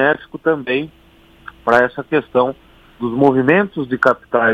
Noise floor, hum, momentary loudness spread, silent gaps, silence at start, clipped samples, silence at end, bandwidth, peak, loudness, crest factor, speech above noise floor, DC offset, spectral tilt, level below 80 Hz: -41 dBFS; none; 10 LU; none; 0 s; under 0.1%; 0 s; 8.8 kHz; 0 dBFS; -17 LUFS; 16 dB; 25 dB; under 0.1%; -7.5 dB/octave; -52 dBFS